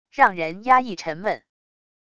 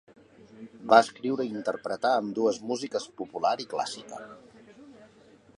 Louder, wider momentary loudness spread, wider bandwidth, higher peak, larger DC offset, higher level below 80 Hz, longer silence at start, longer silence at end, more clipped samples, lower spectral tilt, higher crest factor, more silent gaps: first, -21 LUFS vs -27 LUFS; second, 11 LU vs 22 LU; second, 8 kHz vs 11 kHz; about the same, -2 dBFS vs -4 dBFS; neither; first, -62 dBFS vs -74 dBFS; second, 0.15 s vs 0.55 s; first, 0.8 s vs 0.5 s; neither; about the same, -4.5 dB/octave vs -4 dB/octave; second, 20 dB vs 26 dB; neither